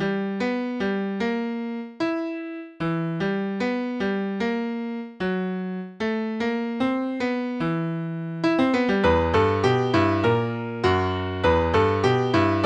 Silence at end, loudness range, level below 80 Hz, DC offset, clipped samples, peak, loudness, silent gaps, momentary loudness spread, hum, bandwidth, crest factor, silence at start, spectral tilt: 0 s; 6 LU; -46 dBFS; under 0.1%; under 0.1%; -6 dBFS; -24 LUFS; none; 9 LU; none; 9 kHz; 16 dB; 0 s; -7 dB/octave